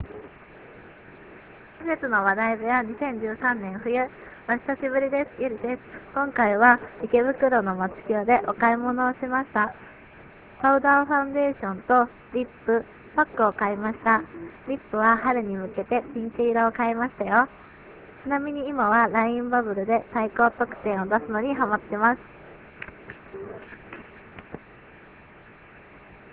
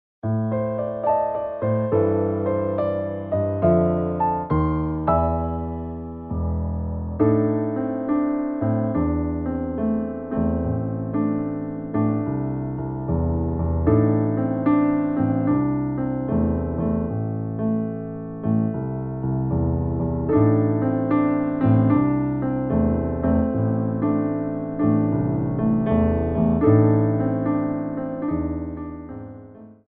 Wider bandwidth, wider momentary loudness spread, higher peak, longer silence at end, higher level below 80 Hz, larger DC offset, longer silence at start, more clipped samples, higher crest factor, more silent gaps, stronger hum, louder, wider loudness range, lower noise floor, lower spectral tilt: first, 4 kHz vs 3.5 kHz; first, 19 LU vs 9 LU; about the same, -2 dBFS vs -4 dBFS; about the same, 0.15 s vs 0.15 s; second, -56 dBFS vs -38 dBFS; neither; second, 0 s vs 0.25 s; neither; about the same, 22 dB vs 18 dB; neither; neither; about the same, -24 LUFS vs -22 LUFS; about the same, 5 LU vs 4 LU; first, -49 dBFS vs -43 dBFS; second, -9.5 dB/octave vs -11 dB/octave